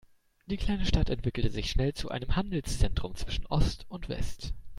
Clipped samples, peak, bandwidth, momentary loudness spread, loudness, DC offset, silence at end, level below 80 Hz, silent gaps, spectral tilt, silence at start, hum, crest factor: under 0.1%; -12 dBFS; 12.5 kHz; 9 LU; -33 LUFS; under 0.1%; 0 s; -34 dBFS; none; -5.5 dB/octave; 0.5 s; none; 18 dB